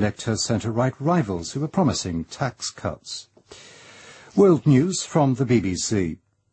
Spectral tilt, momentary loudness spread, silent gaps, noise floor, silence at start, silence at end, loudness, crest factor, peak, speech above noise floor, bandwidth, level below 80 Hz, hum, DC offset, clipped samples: -5.5 dB/octave; 12 LU; none; -47 dBFS; 0 s; 0.35 s; -22 LUFS; 18 dB; -4 dBFS; 25 dB; 8.8 kHz; -50 dBFS; none; under 0.1%; under 0.1%